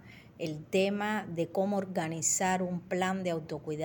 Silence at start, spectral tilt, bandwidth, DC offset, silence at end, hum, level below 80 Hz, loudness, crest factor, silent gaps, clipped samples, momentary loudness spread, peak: 0 s; -4 dB/octave; 18 kHz; under 0.1%; 0 s; none; -68 dBFS; -32 LUFS; 16 dB; none; under 0.1%; 10 LU; -16 dBFS